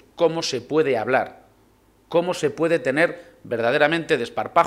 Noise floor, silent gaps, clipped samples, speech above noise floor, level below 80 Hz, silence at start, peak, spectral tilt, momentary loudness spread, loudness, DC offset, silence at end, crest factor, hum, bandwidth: -57 dBFS; none; under 0.1%; 36 dB; -62 dBFS; 0.2 s; -2 dBFS; -4.5 dB/octave; 6 LU; -22 LUFS; under 0.1%; 0 s; 20 dB; none; 13.5 kHz